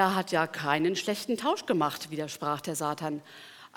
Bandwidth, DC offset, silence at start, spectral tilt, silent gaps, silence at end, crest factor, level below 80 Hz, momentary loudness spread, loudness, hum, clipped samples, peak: 19 kHz; under 0.1%; 0 s; -4 dB/octave; none; 0.1 s; 20 dB; -78 dBFS; 9 LU; -30 LUFS; none; under 0.1%; -10 dBFS